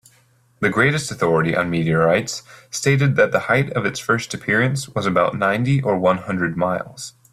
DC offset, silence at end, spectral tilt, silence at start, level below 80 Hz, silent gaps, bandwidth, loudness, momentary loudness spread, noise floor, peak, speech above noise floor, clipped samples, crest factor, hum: under 0.1%; 0.25 s; -5.5 dB/octave; 0.6 s; -54 dBFS; none; 14 kHz; -19 LUFS; 6 LU; -57 dBFS; -4 dBFS; 38 dB; under 0.1%; 16 dB; none